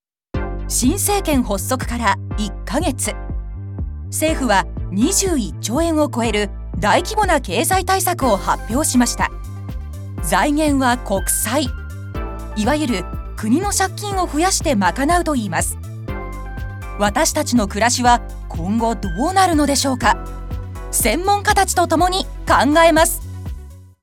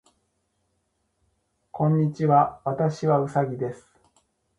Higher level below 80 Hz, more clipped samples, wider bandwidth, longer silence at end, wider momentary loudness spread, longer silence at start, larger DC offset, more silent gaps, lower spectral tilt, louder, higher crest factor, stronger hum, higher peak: first, -30 dBFS vs -64 dBFS; neither; first, 18 kHz vs 8.2 kHz; second, 0.15 s vs 0.85 s; first, 14 LU vs 11 LU; second, 0.35 s vs 1.75 s; neither; neither; second, -4 dB/octave vs -9 dB/octave; first, -18 LUFS vs -24 LUFS; about the same, 18 dB vs 20 dB; neither; first, 0 dBFS vs -6 dBFS